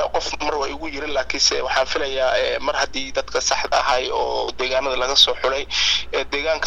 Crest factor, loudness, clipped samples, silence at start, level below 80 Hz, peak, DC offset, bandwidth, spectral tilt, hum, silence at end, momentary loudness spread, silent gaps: 20 dB; -20 LUFS; under 0.1%; 0 s; -40 dBFS; 0 dBFS; under 0.1%; 12.5 kHz; -1 dB/octave; none; 0 s; 8 LU; none